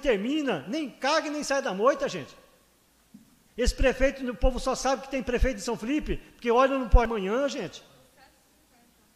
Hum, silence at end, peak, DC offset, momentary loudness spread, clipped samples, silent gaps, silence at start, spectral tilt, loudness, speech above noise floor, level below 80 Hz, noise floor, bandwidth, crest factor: none; 1.35 s; -6 dBFS; under 0.1%; 10 LU; under 0.1%; none; 0 s; -5 dB/octave; -27 LUFS; 37 dB; -34 dBFS; -63 dBFS; 14 kHz; 22 dB